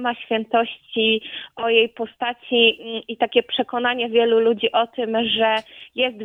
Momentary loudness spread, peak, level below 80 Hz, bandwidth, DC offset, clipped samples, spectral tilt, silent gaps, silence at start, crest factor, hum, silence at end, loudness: 10 LU; -2 dBFS; -66 dBFS; 4.6 kHz; under 0.1%; under 0.1%; -5.5 dB/octave; none; 0 s; 18 dB; none; 0 s; -20 LUFS